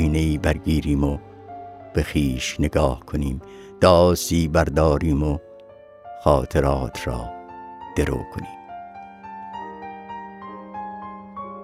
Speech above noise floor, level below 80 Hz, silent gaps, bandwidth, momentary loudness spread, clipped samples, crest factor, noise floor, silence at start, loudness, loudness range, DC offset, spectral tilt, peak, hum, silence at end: 25 dB; -32 dBFS; none; 15.5 kHz; 19 LU; under 0.1%; 22 dB; -45 dBFS; 0 s; -21 LUFS; 12 LU; under 0.1%; -6 dB/octave; -2 dBFS; none; 0 s